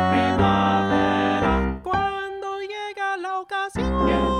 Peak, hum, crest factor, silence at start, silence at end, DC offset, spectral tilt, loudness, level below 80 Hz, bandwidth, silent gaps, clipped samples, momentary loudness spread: -6 dBFS; none; 16 dB; 0 s; 0 s; under 0.1%; -6.5 dB/octave; -23 LUFS; -34 dBFS; 10.5 kHz; none; under 0.1%; 11 LU